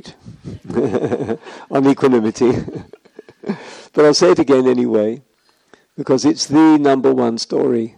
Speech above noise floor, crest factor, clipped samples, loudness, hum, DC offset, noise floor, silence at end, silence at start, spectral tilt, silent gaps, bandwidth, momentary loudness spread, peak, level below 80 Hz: 39 dB; 16 dB; under 0.1%; -15 LUFS; none; under 0.1%; -53 dBFS; 0.1 s; 0.05 s; -5.5 dB/octave; none; 10.5 kHz; 18 LU; 0 dBFS; -54 dBFS